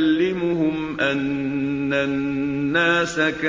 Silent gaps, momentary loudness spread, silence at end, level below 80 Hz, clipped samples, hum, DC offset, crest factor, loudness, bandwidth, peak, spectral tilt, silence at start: none; 5 LU; 0 s; -50 dBFS; under 0.1%; none; under 0.1%; 14 dB; -21 LUFS; 7.8 kHz; -8 dBFS; -5.5 dB/octave; 0 s